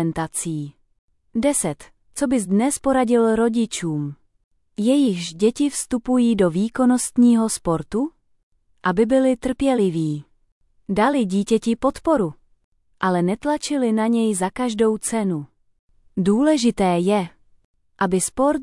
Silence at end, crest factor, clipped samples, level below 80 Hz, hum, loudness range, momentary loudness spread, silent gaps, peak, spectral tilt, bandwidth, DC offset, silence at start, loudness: 0 s; 14 dB; under 0.1%; -50 dBFS; none; 3 LU; 10 LU; 0.99-1.08 s, 4.44-4.51 s, 8.43-8.51 s, 10.52-10.61 s, 12.64-12.72 s, 15.79-15.88 s, 17.65-17.74 s; -6 dBFS; -5.5 dB/octave; 12 kHz; under 0.1%; 0 s; -20 LUFS